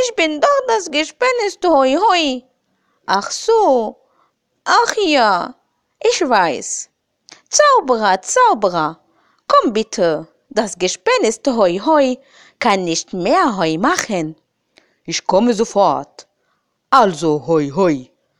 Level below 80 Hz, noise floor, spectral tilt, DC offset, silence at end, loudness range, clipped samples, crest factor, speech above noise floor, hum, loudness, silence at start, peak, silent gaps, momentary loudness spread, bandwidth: -54 dBFS; -67 dBFS; -3.5 dB/octave; under 0.1%; 0.35 s; 2 LU; under 0.1%; 16 dB; 52 dB; none; -15 LUFS; 0 s; 0 dBFS; none; 10 LU; 15 kHz